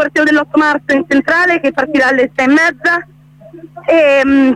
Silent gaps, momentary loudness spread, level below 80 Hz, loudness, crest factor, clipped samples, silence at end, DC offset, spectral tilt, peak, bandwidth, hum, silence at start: none; 5 LU; -50 dBFS; -11 LUFS; 10 dB; under 0.1%; 0 s; under 0.1%; -4.5 dB/octave; 0 dBFS; 11 kHz; none; 0 s